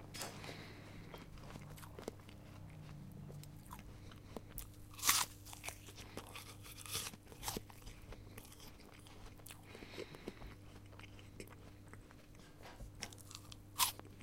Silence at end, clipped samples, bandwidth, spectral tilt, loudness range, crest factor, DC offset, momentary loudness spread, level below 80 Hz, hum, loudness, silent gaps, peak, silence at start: 0 s; under 0.1%; 16.5 kHz; -2 dB/octave; 13 LU; 34 dB; under 0.1%; 20 LU; -62 dBFS; none; -45 LUFS; none; -14 dBFS; 0 s